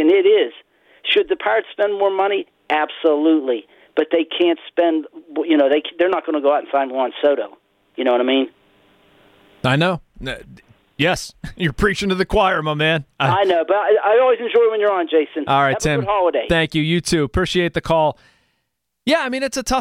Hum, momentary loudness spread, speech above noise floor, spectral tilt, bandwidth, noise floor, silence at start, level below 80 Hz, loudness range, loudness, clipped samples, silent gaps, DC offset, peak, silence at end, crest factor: none; 9 LU; 56 dB; -5 dB/octave; 15.5 kHz; -74 dBFS; 0 s; -42 dBFS; 5 LU; -18 LUFS; under 0.1%; none; under 0.1%; -4 dBFS; 0 s; 14 dB